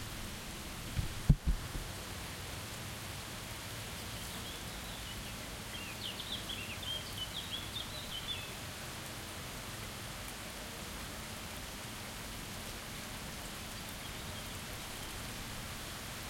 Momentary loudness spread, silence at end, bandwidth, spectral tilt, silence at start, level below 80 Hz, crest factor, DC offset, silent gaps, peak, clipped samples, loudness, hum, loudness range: 4 LU; 0 s; 16.5 kHz; -3.5 dB/octave; 0 s; -48 dBFS; 28 dB; under 0.1%; none; -14 dBFS; under 0.1%; -41 LUFS; none; 4 LU